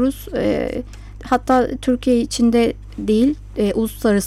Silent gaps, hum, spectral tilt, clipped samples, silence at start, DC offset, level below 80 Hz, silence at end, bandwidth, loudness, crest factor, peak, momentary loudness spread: none; none; -5.5 dB/octave; under 0.1%; 0 s; under 0.1%; -36 dBFS; 0 s; 14.5 kHz; -19 LUFS; 14 dB; -4 dBFS; 10 LU